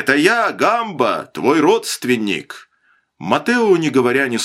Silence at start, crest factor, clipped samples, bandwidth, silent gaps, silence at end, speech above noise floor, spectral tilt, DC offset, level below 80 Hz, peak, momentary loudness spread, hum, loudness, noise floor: 0 s; 16 dB; under 0.1%; 16 kHz; none; 0 s; 44 dB; -4 dB/octave; under 0.1%; -62 dBFS; 0 dBFS; 9 LU; none; -16 LUFS; -60 dBFS